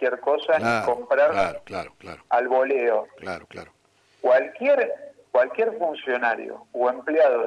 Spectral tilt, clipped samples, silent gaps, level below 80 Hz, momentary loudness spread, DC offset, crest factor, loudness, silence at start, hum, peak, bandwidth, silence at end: -5 dB/octave; under 0.1%; none; -62 dBFS; 14 LU; under 0.1%; 14 dB; -23 LUFS; 0 s; none; -8 dBFS; 10.5 kHz; 0 s